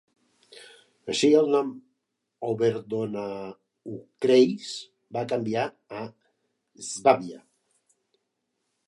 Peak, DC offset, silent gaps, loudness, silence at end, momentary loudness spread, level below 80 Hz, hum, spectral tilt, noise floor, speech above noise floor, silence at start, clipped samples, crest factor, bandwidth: -6 dBFS; under 0.1%; none; -25 LUFS; 1.5 s; 20 LU; -74 dBFS; none; -5 dB/octave; -79 dBFS; 54 dB; 0.55 s; under 0.1%; 22 dB; 11.5 kHz